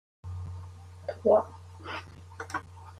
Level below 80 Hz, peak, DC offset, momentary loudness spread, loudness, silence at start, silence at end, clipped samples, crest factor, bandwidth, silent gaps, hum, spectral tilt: -64 dBFS; -10 dBFS; under 0.1%; 21 LU; -31 LUFS; 0.25 s; 0 s; under 0.1%; 22 dB; 12 kHz; none; none; -6.5 dB/octave